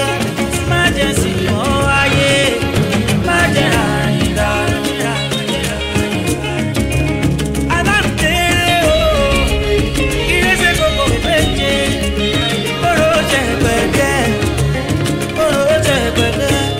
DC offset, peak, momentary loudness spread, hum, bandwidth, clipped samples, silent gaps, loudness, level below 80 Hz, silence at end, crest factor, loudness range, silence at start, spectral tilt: under 0.1%; 0 dBFS; 5 LU; none; 16 kHz; under 0.1%; none; -14 LUFS; -26 dBFS; 0 s; 14 dB; 3 LU; 0 s; -4.5 dB/octave